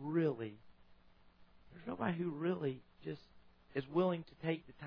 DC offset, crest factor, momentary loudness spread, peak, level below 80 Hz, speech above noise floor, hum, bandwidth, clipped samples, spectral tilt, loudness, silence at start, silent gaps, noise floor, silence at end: under 0.1%; 20 dB; 13 LU; -20 dBFS; -72 dBFS; 24 dB; none; 5.2 kHz; under 0.1%; -6.5 dB/octave; -40 LUFS; 0 s; none; -64 dBFS; 0 s